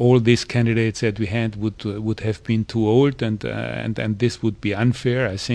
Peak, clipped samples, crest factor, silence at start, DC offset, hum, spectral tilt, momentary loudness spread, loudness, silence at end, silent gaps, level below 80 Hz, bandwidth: -2 dBFS; under 0.1%; 18 dB; 0 s; under 0.1%; none; -6.5 dB/octave; 9 LU; -21 LUFS; 0 s; none; -46 dBFS; 10 kHz